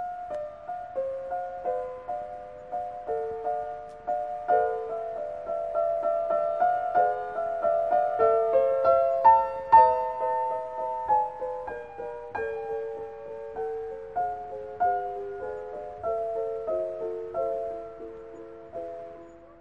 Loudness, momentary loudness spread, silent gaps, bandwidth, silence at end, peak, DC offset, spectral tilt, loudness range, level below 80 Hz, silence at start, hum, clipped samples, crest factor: -28 LUFS; 16 LU; none; 6 kHz; 0 s; -6 dBFS; 0.1%; -6.5 dB/octave; 11 LU; -60 dBFS; 0 s; none; under 0.1%; 20 dB